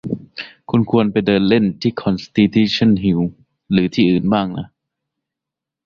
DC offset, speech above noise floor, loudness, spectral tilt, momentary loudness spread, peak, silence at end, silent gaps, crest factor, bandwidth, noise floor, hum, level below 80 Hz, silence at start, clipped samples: under 0.1%; 69 dB; -17 LUFS; -7.5 dB/octave; 12 LU; -2 dBFS; 1.2 s; none; 16 dB; 7 kHz; -85 dBFS; none; -46 dBFS; 0.05 s; under 0.1%